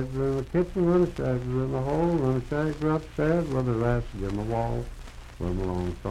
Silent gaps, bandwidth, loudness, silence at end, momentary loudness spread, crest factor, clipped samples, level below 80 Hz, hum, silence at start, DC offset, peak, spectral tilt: none; 12.5 kHz; -27 LUFS; 0 s; 8 LU; 14 dB; under 0.1%; -40 dBFS; none; 0 s; under 0.1%; -12 dBFS; -8.5 dB/octave